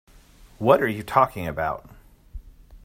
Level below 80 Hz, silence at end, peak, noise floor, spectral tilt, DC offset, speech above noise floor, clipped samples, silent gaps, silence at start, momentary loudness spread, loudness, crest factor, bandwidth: -46 dBFS; 0.1 s; -2 dBFS; -51 dBFS; -6.5 dB/octave; under 0.1%; 29 dB; under 0.1%; none; 0.6 s; 9 LU; -22 LUFS; 24 dB; 16 kHz